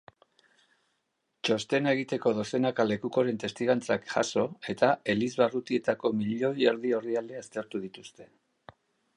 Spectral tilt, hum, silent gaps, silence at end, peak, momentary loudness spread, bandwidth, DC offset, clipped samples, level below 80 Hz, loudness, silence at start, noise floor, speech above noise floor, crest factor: -5 dB/octave; none; none; 0.9 s; -10 dBFS; 10 LU; 11 kHz; under 0.1%; under 0.1%; -72 dBFS; -29 LUFS; 1.45 s; -79 dBFS; 50 dB; 20 dB